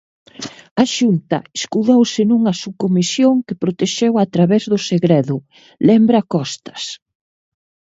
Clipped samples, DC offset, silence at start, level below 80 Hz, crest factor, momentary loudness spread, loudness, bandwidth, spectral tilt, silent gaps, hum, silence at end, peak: under 0.1%; under 0.1%; 0.4 s; -60 dBFS; 16 dB; 13 LU; -16 LUFS; 8 kHz; -6 dB/octave; 0.71-0.76 s; none; 1 s; 0 dBFS